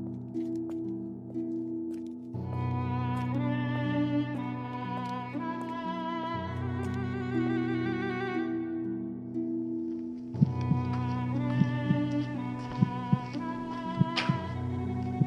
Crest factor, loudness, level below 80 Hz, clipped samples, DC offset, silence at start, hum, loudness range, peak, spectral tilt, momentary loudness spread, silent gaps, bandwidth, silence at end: 22 dB; -32 LUFS; -60 dBFS; under 0.1%; under 0.1%; 0 s; none; 3 LU; -10 dBFS; -8 dB/octave; 8 LU; none; 8 kHz; 0 s